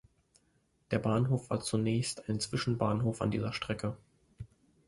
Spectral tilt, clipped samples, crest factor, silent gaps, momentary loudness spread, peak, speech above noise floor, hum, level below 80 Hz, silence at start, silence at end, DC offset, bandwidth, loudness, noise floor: -6 dB/octave; under 0.1%; 20 dB; none; 20 LU; -14 dBFS; 41 dB; none; -58 dBFS; 0.9 s; 0.4 s; under 0.1%; 11.5 kHz; -33 LUFS; -73 dBFS